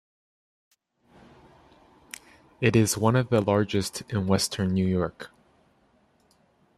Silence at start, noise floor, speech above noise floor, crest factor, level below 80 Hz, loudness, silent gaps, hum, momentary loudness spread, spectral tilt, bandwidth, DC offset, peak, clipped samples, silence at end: 2.6 s; -64 dBFS; 40 dB; 22 dB; -60 dBFS; -25 LUFS; none; none; 22 LU; -5.5 dB/octave; 14 kHz; under 0.1%; -6 dBFS; under 0.1%; 1.5 s